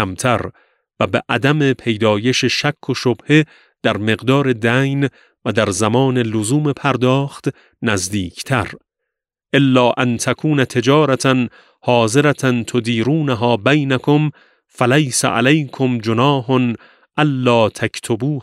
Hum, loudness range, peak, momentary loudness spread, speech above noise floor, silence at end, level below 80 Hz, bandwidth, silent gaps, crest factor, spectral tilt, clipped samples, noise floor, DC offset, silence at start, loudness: none; 2 LU; 0 dBFS; 8 LU; 63 dB; 0 s; -54 dBFS; 14 kHz; none; 16 dB; -5.5 dB/octave; under 0.1%; -79 dBFS; under 0.1%; 0 s; -16 LUFS